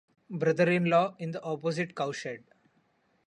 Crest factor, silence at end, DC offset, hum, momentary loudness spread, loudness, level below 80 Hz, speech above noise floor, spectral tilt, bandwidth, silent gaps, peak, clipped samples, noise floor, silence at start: 18 dB; 0.9 s; under 0.1%; none; 15 LU; -29 LUFS; -74 dBFS; 42 dB; -6.5 dB/octave; 10 kHz; none; -12 dBFS; under 0.1%; -70 dBFS; 0.3 s